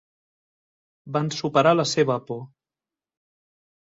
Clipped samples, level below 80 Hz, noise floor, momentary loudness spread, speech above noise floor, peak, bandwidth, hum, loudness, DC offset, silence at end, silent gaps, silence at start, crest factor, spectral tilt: under 0.1%; -68 dBFS; under -90 dBFS; 14 LU; over 68 dB; -6 dBFS; 8 kHz; none; -22 LUFS; under 0.1%; 1.5 s; none; 1.05 s; 20 dB; -5 dB/octave